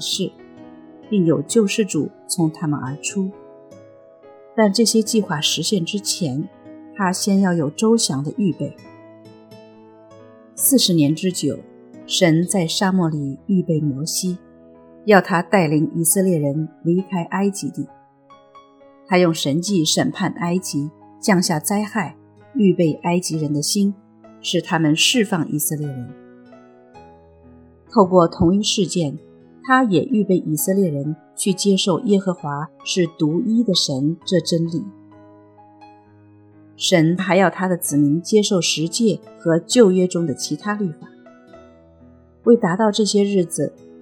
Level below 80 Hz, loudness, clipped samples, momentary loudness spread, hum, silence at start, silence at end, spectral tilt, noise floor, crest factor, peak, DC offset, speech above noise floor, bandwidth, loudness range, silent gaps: -56 dBFS; -19 LUFS; under 0.1%; 11 LU; none; 0 s; 0.05 s; -4.5 dB/octave; -50 dBFS; 20 dB; 0 dBFS; under 0.1%; 31 dB; 19 kHz; 4 LU; none